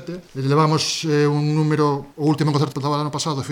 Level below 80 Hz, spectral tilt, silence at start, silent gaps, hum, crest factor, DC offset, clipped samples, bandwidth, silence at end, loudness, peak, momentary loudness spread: -58 dBFS; -5.5 dB/octave; 0 s; none; none; 14 dB; under 0.1%; under 0.1%; 14 kHz; 0 s; -20 LUFS; -6 dBFS; 5 LU